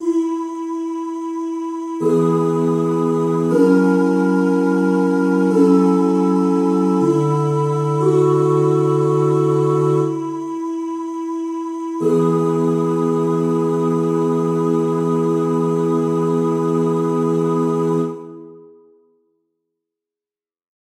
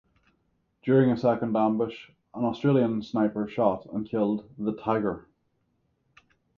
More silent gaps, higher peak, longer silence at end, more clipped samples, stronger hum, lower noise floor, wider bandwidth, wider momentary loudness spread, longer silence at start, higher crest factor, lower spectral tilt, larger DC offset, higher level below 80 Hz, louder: neither; first, -2 dBFS vs -8 dBFS; first, 2.4 s vs 1.4 s; neither; neither; first, under -90 dBFS vs -73 dBFS; first, 12.5 kHz vs 6.8 kHz; about the same, 10 LU vs 10 LU; second, 0 s vs 0.85 s; about the same, 14 dB vs 18 dB; about the same, -8.5 dB/octave vs -9.5 dB/octave; neither; about the same, -66 dBFS vs -62 dBFS; first, -17 LUFS vs -26 LUFS